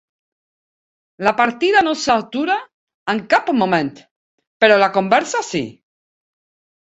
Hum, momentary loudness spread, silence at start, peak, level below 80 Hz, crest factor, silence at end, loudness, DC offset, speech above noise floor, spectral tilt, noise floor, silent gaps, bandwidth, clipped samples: none; 10 LU; 1.2 s; 0 dBFS; -60 dBFS; 18 dB; 1.1 s; -17 LUFS; under 0.1%; over 74 dB; -4 dB/octave; under -90 dBFS; 2.73-2.87 s, 2.94-3.06 s, 4.11-4.38 s, 4.47-4.60 s; 8.2 kHz; under 0.1%